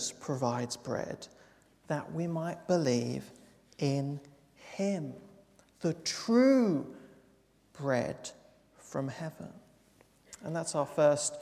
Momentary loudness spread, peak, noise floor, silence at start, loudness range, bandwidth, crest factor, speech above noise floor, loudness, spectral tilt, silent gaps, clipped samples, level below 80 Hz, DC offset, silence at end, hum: 19 LU; -14 dBFS; -66 dBFS; 0 s; 7 LU; 14.5 kHz; 20 dB; 34 dB; -32 LUFS; -5.5 dB/octave; none; under 0.1%; -70 dBFS; under 0.1%; 0 s; none